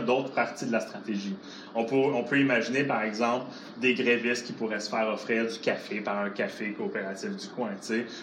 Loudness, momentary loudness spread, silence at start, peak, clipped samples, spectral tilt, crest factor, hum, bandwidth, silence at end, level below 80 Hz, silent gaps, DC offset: -29 LUFS; 10 LU; 0 s; -10 dBFS; under 0.1%; -5 dB/octave; 18 dB; none; 12 kHz; 0 s; -82 dBFS; none; under 0.1%